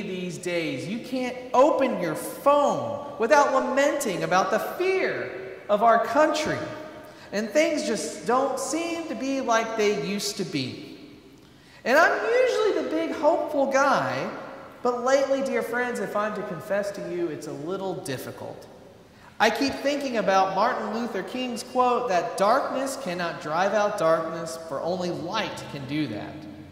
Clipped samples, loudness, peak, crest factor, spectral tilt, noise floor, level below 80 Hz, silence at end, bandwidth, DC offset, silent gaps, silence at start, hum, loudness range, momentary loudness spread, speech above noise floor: under 0.1%; -25 LUFS; -6 dBFS; 18 dB; -4 dB/octave; -51 dBFS; -64 dBFS; 0 s; 16 kHz; under 0.1%; none; 0 s; none; 5 LU; 13 LU; 26 dB